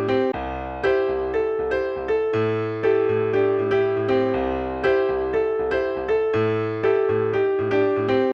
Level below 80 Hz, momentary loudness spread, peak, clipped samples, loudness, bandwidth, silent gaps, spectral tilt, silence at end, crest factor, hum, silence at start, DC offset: -44 dBFS; 3 LU; -8 dBFS; under 0.1%; -22 LUFS; 6.2 kHz; none; -8 dB/octave; 0 s; 14 dB; none; 0 s; under 0.1%